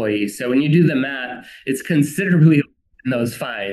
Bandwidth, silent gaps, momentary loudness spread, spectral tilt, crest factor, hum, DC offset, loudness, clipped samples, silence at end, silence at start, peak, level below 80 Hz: 12.5 kHz; none; 15 LU; -6.5 dB/octave; 16 dB; none; under 0.1%; -18 LUFS; under 0.1%; 0 s; 0 s; -2 dBFS; -62 dBFS